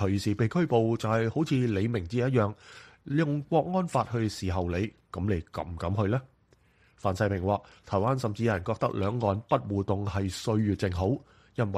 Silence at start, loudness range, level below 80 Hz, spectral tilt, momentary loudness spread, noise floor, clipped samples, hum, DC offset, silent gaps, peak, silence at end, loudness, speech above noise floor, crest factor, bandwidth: 0 s; 4 LU; -52 dBFS; -7.5 dB/octave; 6 LU; -64 dBFS; under 0.1%; none; under 0.1%; none; -10 dBFS; 0 s; -29 LUFS; 36 dB; 18 dB; 13 kHz